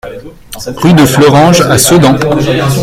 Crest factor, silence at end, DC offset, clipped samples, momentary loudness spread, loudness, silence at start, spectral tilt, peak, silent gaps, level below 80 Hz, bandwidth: 8 dB; 0 s; under 0.1%; 2%; 18 LU; -6 LUFS; 0.05 s; -5 dB/octave; 0 dBFS; none; -32 dBFS; 17 kHz